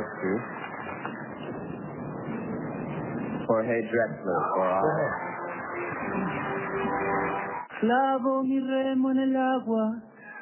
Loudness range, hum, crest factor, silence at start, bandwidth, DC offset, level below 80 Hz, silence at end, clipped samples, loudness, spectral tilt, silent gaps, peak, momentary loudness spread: 6 LU; none; 16 dB; 0 s; 3.2 kHz; under 0.1%; -60 dBFS; 0 s; under 0.1%; -29 LUFS; -5.5 dB/octave; none; -12 dBFS; 12 LU